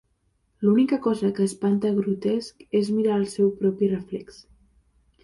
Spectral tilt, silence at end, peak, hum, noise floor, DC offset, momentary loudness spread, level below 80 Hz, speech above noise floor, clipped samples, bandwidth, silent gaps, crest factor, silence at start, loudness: -7 dB/octave; 0.9 s; -10 dBFS; none; -69 dBFS; under 0.1%; 7 LU; -62 dBFS; 46 dB; under 0.1%; 11.5 kHz; none; 14 dB; 0.6 s; -24 LUFS